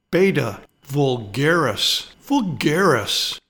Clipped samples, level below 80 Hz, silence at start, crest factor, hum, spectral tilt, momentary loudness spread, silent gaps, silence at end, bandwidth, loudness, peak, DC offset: under 0.1%; -52 dBFS; 0.1 s; 16 dB; none; -4.5 dB/octave; 7 LU; none; 0.1 s; 19 kHz; -20 LUFS; -4 dBFS; under 0.1%